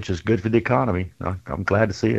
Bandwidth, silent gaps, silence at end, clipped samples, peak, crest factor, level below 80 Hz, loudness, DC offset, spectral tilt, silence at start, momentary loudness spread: 8.2 kHz; none; 0 s; under 0.1%; -2 dBFS; 20 dB; -44 dBFS; -22 LUFS; under 0.1%; -7.5 dB/octave; 0 s; 9 LU